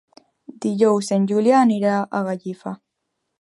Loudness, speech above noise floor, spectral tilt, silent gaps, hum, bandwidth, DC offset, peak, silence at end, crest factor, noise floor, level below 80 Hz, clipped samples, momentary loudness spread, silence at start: -19 LUFS; 58 dB; -6.5 dB/octave; none; none; 11.5 kHz; under 0.1%; -4 dBFS; 0.65 s; 16 dB; -77 dBFS; -72 dBFS; under 0.1%; 16 LU; 0.5 s